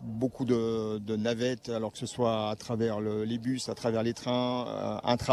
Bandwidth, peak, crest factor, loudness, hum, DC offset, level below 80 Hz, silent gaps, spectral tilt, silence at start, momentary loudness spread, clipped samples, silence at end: 13 kHz; -12 dBFS; 18 dB; -31 LUFS; none; under 0.1%; -62 dBFS; none; -6 dB/octave; 0 s; 5 LU; under 0.1%; 0 s